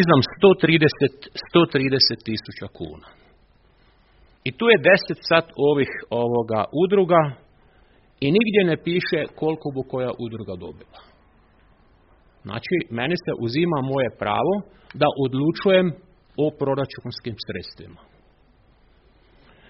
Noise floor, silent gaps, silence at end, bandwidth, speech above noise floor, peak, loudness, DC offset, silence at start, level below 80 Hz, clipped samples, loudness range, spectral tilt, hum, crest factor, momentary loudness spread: -57 dBFS; none; 1.8 s; 5.8 kHz; 36 dB; 0 dBFS; -21 LUFS; under 0.1%; 0 s; -56 dBFS; under 0.1%; 10 LU; -4 dB/octave; none; 22 dB; 17 LU